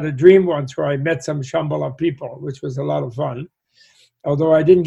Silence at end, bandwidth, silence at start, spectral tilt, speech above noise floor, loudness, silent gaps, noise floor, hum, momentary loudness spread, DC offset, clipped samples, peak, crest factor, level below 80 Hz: 0 s; 8.2 kHz; 0 s; -7.5 dB/octave; 37 dB; -18 LUFS; none; -54 dBFS; none; 18 LU; under 0.1%; under 0.1%; 0 dBFS; 18 dB; -54 dBFS